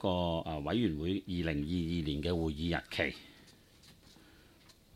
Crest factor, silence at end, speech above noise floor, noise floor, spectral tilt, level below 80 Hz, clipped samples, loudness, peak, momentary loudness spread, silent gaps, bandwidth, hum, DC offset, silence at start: 20 dB; 0.85 s; 27 dB; -62 dBFS; -7 dB/octave; -50 dBFS; under 0.1%; -35 LUFS; -16 dBFS; 4 LU; none; 15.5 kHz; none; under 0.1%; 0 s